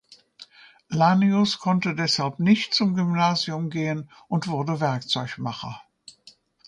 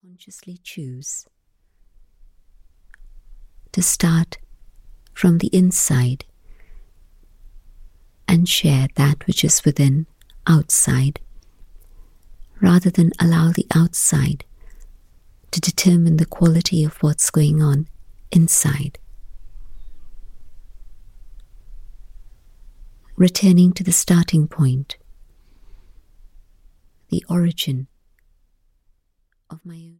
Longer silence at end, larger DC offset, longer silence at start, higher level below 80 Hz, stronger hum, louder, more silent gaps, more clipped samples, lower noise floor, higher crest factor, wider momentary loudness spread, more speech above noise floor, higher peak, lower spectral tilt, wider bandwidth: first, 0.9 s vs 0.2 s; neither; about the same, 0.4 s vs 0.35 s; second, -66 dBFS vs -42 dBFS; neither; second, -23 LUFS vs -17 LUFS; neither; neither; second, -55 dBFS vs -66 dBFS; about the same, 18 dB vs 18 dB; second, 12 LU vs 17 LU; second, 32 dB vs 49 dB; second, -6 dBFS vs -2 dBFS; about the same, -5.5 dB/octave vs -5 dB/octave; second, 10.5 kHz vs 16.5 kHz